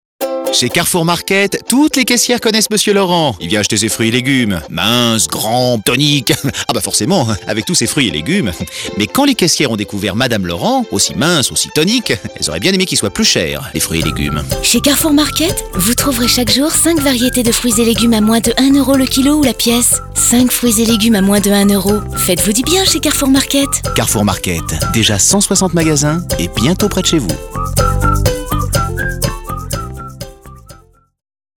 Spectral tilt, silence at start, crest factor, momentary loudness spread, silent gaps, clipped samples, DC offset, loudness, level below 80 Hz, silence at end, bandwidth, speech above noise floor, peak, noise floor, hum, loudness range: -3.5 dB/octave; 0.2 s; 12 dB; 7 LU; none; under 0.1%; under 0.1%; -12 LUFS; -28 dBFS; 0.85 s; over 20 kHz; 30 dB; 0 dBFS; -43 dBFS; none; 3 LU